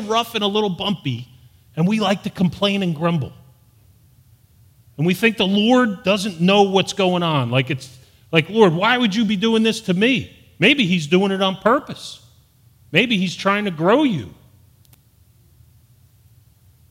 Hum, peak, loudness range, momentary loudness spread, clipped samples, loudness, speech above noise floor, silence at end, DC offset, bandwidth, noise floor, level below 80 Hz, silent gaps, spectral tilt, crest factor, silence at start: none; 0 dBFS; 5 LU; 10 LU; under 0.1%; -18 LUFS; 36 dB; 2.6 s; under 0.1%; 16 kHz; -54 dBFS; -58 dBFS; none; -5.5 dB/octave; 20 dB; 0 s